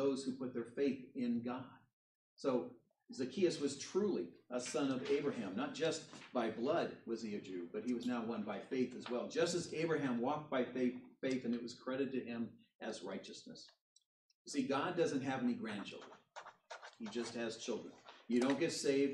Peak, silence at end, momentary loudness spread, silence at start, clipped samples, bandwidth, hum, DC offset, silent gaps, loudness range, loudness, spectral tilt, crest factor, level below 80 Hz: -22 dBFS; 0 s; 15 LU; 0 s; under 0.1%; 11.5 kHz; none; under 0.1%; 1.93-2.37 s, 12.75-12.79 s, 13.81-13.96 s, 14.06-14.29 s, 14.35-14.45 s; 4 LU; -40 LUFS; -5 dB/octave; 18 dB; -86 dBFS